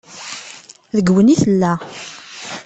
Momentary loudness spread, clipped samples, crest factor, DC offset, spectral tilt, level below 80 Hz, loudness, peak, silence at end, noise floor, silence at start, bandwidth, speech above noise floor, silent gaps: 20 LU; under 0.1%; 14 dB; under 0.1%; -6 dB/octave; -52 dBFS; -15 LUFS; -2 dBFS; 0.05 s; -39 dBFS; 0.15 s; 8.6 kHz; 25 dB; none